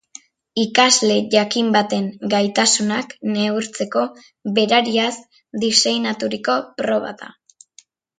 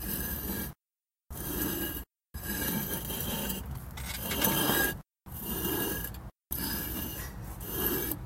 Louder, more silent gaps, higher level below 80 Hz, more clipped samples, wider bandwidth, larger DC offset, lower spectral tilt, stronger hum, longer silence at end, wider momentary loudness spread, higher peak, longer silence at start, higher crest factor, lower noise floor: first, -18 LUFS vs -32 LUFS; neither; second, -66 dBFS vs -46 dBFS; neither; second, 9.6 kHz vs 16.5 kHz; neither; about the same, -2.5 dB/octave vs -3.5 dB/octave; neither; first, 0.9 s vs 0 s; second, 9 LU vs 14 LU; first, 0 dBFS vs -10 dBFS; first, 0.55 s vs 0 s; about the same, 20 dB vs 24 dB; second, -52 dBFS vs under -90 dBFS